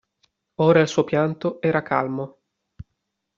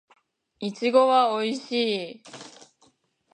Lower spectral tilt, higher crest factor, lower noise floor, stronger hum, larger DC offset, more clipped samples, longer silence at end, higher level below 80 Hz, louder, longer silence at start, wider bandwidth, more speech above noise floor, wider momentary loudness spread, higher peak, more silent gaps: about the same, -5.5 dB/octave vs -4.5 dB/octave; about the same, 20 dB vs 20 dB; first, -78 dBFS vs -64 dBFS; neither; neither; neither; second, 0.55 s vs 0.85 s; first, -58 dBFS vs -82 dBFS; about the same, -21 LUFS vs -23 LUFS; about the same, 0.6 s vs 0.6 s; second, 7.6 kHz vs 9.8 kHz; first, 57 dB vs 40 dB; second, 14 LU vs 23 LU; about the same, -4 dBFS vs -6 dBFS; neither